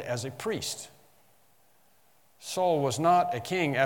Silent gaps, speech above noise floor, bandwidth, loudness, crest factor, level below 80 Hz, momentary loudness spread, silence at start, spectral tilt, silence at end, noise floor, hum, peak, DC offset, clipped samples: none; 38 dB; 18 kHz; -28 LUFS; 20 dB; -72 dBFS; 15 LU; 0 s; -4.5 dB/octave; 0 s; -66 dBFS; none; -10 dBFS; under 0.1%; under 0.1%